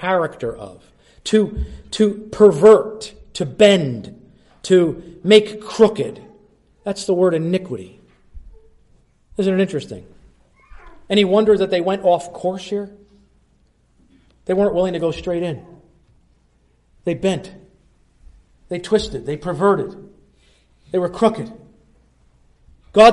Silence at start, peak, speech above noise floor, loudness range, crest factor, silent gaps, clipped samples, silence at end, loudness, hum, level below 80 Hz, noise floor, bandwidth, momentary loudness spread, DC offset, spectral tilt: 0 s; 0 dBFS; 41 dB; 10 LU; 18 dB; none; under 0.1%; 0 s; -18 LUFS; none; -44 dBFS; -58 dBFS; 11.5 kHz; 18 LU; under 0.1%; -5.5 dB/octave